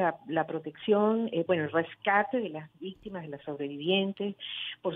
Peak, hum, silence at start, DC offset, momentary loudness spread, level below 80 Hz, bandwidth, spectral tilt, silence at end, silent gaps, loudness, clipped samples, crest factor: -12 dBFS; none; 0 s; under 0.1%; 14 LU; -72 dBFS; 4.1 kHz; -8.5 dB/octave; 0 s; none; -30 LUFS; under 0.1%; 20 dB